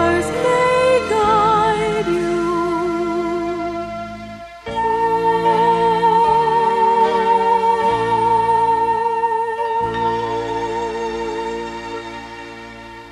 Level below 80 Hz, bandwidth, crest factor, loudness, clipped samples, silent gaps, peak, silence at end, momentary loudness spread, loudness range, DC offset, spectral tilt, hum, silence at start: -44 dBFS; 12 kHz; 12 dB; -17 LUFS; under 0.1%; none; -4 dBFS; 0 s; 15 LU; 6 LU; under 0.1%; -5.5 dB/octave; none; 0 s